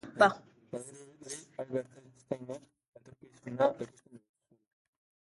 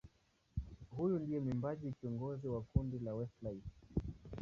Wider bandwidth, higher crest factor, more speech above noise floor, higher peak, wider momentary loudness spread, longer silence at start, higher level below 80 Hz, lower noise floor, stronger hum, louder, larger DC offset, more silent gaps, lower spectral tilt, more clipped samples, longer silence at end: first, 11.5 kHz vs 7 kHz; about the same, 26 dB vs 22 dB; second, 25 dB vs 35 dB; first, -10 dBFS vs -20 dBFS; first, 22 LU vs 10 LU; about the same, 0.05 s vs 0.05 s; second, -78 dBFS vs -54 dBFS; second, -57 dBFS vs -75 dBFS; neither; first, -34 LUFS vs -42 LUFS; neither; first, 2.88-2.92 s vs none; second, -4.5 dB/octave vs -10.5 dB/octave; neither; first, 1.1 s vs 0 s